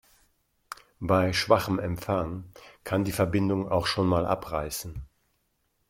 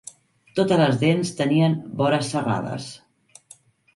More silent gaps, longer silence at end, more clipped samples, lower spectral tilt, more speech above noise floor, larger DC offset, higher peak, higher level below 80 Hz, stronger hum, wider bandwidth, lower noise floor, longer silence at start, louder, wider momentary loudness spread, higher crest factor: neither; second, 0.85 s vs 1 s; neither; about the same, -5.5 dB/octave vs -6 dB/octave; first, 47 dB vs 32 dB; neither; about the same, -6 dBFS vs -6 dBFS; first, -50 dBFS vs -62 dBFS; neither; first, 16.5 kHz vs 11.5 kHz; first, -74 dBFS vs -53 dBFS; first, 0.7 s vs 0.55 s; second, -27 LUFS vs -22 LUFS; first, 19 LU vs 13 LU; first, 24 dB vs 16 dB